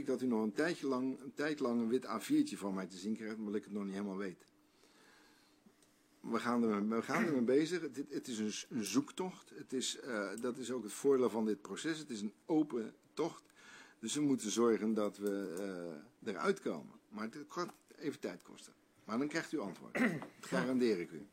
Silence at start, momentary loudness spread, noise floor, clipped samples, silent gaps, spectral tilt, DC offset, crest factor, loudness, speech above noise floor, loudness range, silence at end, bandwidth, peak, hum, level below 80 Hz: 0 s; 13 LU; -70 dBFS; under 0.1%; none; -4.5 dB/octave; under 0.1%; 20 dB; -38 LUFS; 32 dB; 6 LU; 0.05 s; 16 kHz; -18 dBFS; none; -86 dBFS